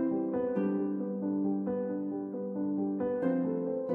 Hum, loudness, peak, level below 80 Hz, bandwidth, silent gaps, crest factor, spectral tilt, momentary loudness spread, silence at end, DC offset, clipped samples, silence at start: none; -33 LUFS; -18 dBFS; -72 dBFS; 3.3 kHz; none; 12 dB; -12 dB/octave; 5 LU; 0 s; under 0.1%; under 0.1%; 0 s